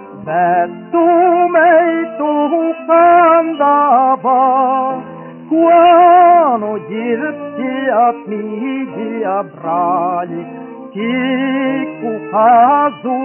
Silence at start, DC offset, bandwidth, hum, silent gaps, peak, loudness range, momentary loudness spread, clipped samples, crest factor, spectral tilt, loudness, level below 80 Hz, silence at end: 0 s; under 0.1%; 3.2 kHz; none; none; 0 dBFS; 7 LU; 14 LU; under 0.1%; 12 dB; -4 dB/octave; -12 LUFS; -62 dBFS; 0 s